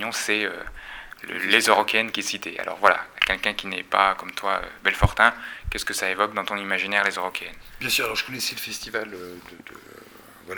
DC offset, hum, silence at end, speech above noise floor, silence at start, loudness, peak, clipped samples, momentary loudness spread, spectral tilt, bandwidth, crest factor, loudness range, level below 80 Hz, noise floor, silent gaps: under 0.1%; none; 0 s; 22 dB; 0 s; -23 LUFS; 0 dBFS; under 0.1%; 19 LU; -2.5 dB/octave; over 20 kHz; 26 dB; 5 LU; -42 dBFS; -47 dBFS; none